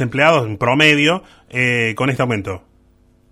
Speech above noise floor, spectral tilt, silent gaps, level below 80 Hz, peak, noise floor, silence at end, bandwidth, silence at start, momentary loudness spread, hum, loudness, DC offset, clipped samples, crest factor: 37 dB; -5 dB/octave; none; -50 dBFS; 0 dBFS; -53 dBFS; 0.75 s; 15 kHz; 0 s; 13 LU; none; -15 LUFS; under 0.1%; under 0.1%; 18 dB